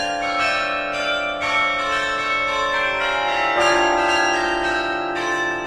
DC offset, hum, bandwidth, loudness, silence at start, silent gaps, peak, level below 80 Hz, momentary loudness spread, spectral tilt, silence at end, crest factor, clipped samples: under 0.1%; none; 13.5 kHz; -19 LUFS; 0 s; none; -6 dBFS; -46 dBFS; 5 LU; -2.5 dB/octave; 0 s; 16 dB; under 0.1%